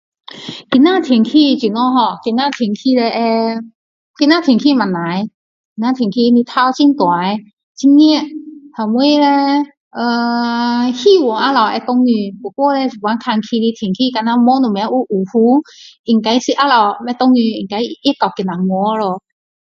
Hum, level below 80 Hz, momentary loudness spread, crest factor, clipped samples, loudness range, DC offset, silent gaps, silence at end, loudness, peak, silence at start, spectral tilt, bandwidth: none; -64 dBFS; 9 LU; 14 dB; under 0.1%; 2 LU; under 0.1%; 3.75-4.14 s, 5.34-5.76 s, 7.53-7.57 s, 7.63-7.75 s, 9.77-9.91 s, 15.99-16.04 s; 0.4 s; -14 LUFS; 0 dBFS; 0.3 s; -5.5 dB/octave; 7.4 kHz